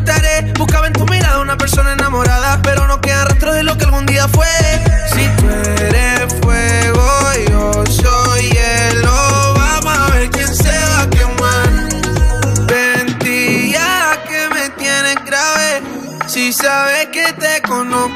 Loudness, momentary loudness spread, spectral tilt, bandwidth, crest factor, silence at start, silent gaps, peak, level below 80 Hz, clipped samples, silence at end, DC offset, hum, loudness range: -12 LUFS; 3 LU; -4 dB/octave; 16 kHz; 12 dB; 0 s; none; 0 dBFS; -18 dBFS; under 0.1%; 0 s; under 0.1%; none; 2 LU